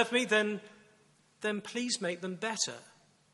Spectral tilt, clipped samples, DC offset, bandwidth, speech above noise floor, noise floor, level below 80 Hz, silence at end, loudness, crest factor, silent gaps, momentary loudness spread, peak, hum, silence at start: -2.5 dB/octave; under 0.1%; under 0.1%; 11.5 kHz; 33 dB; -66 dBFS; -84 dBFS; 0.45 s; -33 LUFS; 22 dB; none; 10 LU; -12 dBFS; none; 0 s